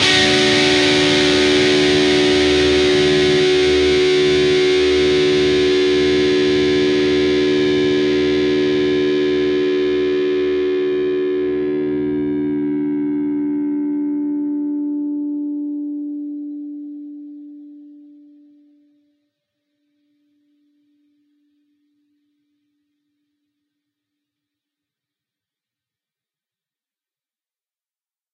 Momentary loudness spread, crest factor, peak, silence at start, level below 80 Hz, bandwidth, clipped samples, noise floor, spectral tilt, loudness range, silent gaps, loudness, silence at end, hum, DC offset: 12 LU; 18 dB; -2 dBFS; 0 s; -44 dBFS; 11 kHz; under 0.1%; under -90 dBFS; -4 dB/octave; 13 LU; none; -16 LUFS; 10.4 s; none; under 0.1%